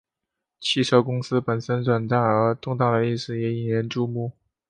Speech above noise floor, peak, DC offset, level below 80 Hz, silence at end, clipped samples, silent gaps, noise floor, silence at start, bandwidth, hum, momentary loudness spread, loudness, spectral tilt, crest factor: 62 dB; -4 dBFS; under 0.1%; -62 dBFS; 0.4 s; under 0.1%; none; -84 dBFS; 0.6 s; 10 kHz; none; 7 LU; -23 LUFS; -6.5 dB/octave; 20 dB